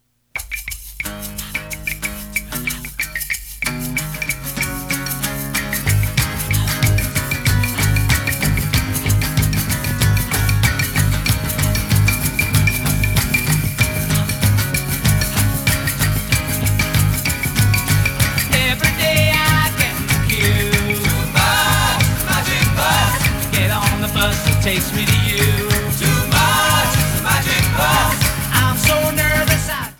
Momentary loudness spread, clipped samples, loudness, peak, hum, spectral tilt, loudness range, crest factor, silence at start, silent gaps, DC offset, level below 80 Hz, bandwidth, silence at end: 8 LU; under 0.1%; -17 LUFS; 0 dBFS; none; -4 dB/octave; 7 LU; 16 dB; 0.35 s; none; under 0.1%; -28 dBFS; over 20 kHz; 0.05 s